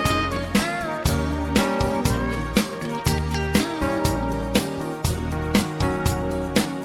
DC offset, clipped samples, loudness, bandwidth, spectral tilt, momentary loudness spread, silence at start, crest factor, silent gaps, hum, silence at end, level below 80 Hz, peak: under 0.1%; under 0.1%; -23 LUFS; 18 kHz; -5 dB/octave; 4 LU; 0 s; 20 dB; none; none; 0 s; -32 dBFS; -2 dBFS